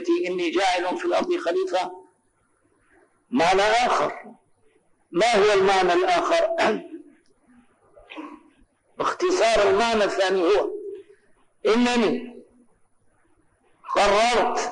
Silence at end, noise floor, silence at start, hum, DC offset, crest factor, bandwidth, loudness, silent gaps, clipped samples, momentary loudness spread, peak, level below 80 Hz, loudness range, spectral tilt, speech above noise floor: 0 s; -66 dBFS; 0 s; none; under 0.1%; 12 dB; 10 kHz; -21 LUFS; none; under 0.1%; 18 LU; -12 dBFS; -52 dBFS; 5 LU; -3.5 dB/octave; 46 dB